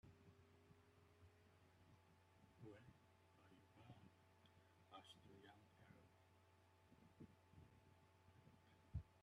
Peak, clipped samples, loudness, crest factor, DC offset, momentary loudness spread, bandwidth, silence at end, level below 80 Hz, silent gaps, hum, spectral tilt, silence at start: -40 dBFS; under 0.1%; -64 LUFS; 28 dB; under 0.1%; 10 LU; 9.6 kHz; 0 s; -76 dBFS; none; none; -6 dB/octave; 0.05 s